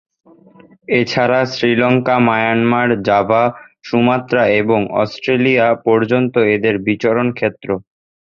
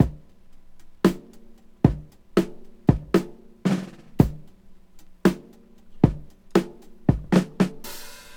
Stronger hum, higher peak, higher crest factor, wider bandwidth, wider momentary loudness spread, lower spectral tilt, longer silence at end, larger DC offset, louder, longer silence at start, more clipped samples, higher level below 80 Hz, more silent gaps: neither; about the same, -2 dBFS vs 0 dBFS; second, 14 dB vs 24 dB; second, 7 kHz vs 17.5 kHz; second, 6 LU vs 16 LU; about the same, -7 dB/octave vs -7.5 dB/octave; first, 0.5 s vs 0.05 s; neither; first, -15 LUFS vs -24 LUFS; first, 0.9 s vs 0 s; neither; second, -52 dBFS vs -40 dBFS; neither